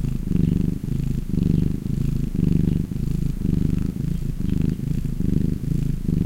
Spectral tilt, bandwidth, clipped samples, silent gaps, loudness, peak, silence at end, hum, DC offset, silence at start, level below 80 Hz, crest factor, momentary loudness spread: -9 dB/octave; 16 kHz; under 0.1%; none; -24 LUFS; -4 dBFS; 0 s; none; 0.1%; 0 s; -28 dBFS; 16 dB; 5 LU